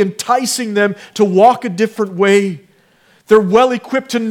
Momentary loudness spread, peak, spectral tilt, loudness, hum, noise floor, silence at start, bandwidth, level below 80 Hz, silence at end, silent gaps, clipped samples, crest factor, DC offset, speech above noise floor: 8 LU; 0 dBFS; -4.5 dB/octave; -14 LUFS; none; -52 dBFS; 0 s; 16.5 kHz; -58 dBFS; 0 s; none; under 0.1%; 14 dB; under 0.1%; 39 dB